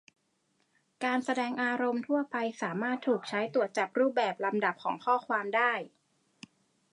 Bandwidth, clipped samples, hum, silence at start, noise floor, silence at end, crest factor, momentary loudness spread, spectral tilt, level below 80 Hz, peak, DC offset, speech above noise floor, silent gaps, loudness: 11 kHz; under 0.1%; none; 1 s; -75 dBFS; 1.05 s; 18 dB; 6 LU; -5 dB/octave; -86 dBFS; -14 dBFS; under 0.1%; 44 dB; none; -31 LUFS